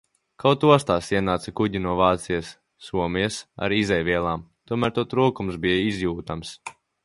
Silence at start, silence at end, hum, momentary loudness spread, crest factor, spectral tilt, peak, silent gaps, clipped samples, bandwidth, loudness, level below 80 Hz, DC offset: 0.4 s; 0.35 s; none; 14 LU; 22 dB; -5.5 dB/octave; 0 dBFS; none; under 0.1%; 11.5 kHz; -23 LUFS; -46 dBFS; under 0.1%